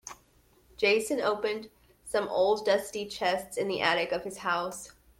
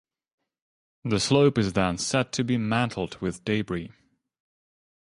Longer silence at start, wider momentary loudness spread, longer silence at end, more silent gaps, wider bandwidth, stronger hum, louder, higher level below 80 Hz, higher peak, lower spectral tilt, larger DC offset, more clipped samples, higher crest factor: second, 0.05 s vs 1.05 s; about the same, 11 LU vs 12 LU; second, 0.3 s vs 1.15 s; neither; first, 16.5 kHz vs 11.5 kHz; neither; second, -29 LUFS vs -25 LUFS; second, -64 dBFS vs -52 dBFS; second, -10 dBFS vs -6 dBFS; second, -3 dB/octave vs -5 dB/octave; neither; neither; about the same, 20 dB vs 20 dB